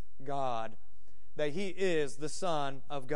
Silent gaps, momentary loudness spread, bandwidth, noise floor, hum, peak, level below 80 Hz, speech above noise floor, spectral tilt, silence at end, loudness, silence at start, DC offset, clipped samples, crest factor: none; 10 LU; 11.5 kHz; -66 dBFS; none; -18 dBFS; -66 dBFS; 31 dB; -4.5 dB/octave; 0 s; -36 LUFS; 0.2 s; 3%; under 0.1%; 18 dB